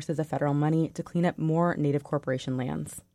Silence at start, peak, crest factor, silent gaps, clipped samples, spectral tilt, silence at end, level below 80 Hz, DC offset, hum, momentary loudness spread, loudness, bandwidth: 0 s; -14 dBFS; 14 dB; none; under 0.1%; -7.5 dB/octave; 0.15 s; -60 dBFS; under 0.1%; none; 6 LU; -28 LUFS; 13.5 kHz